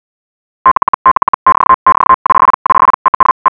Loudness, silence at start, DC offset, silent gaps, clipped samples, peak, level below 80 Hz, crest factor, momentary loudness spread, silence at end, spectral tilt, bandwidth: -9 LUFS; 0.65 s; under 0.1%; 0.71-1.05 s, 1.11-1.46 s, 1.74-1.86 s, 2.14-2.25 s, 2.54-2.65 s, 2.94-3.20 s, 3.31-3.45 s; 0.2%; 0 dBFS; -40 dBFS; 10 dB; 3 LU; 0 s; -8.5 dB/octave; 3.7 kHz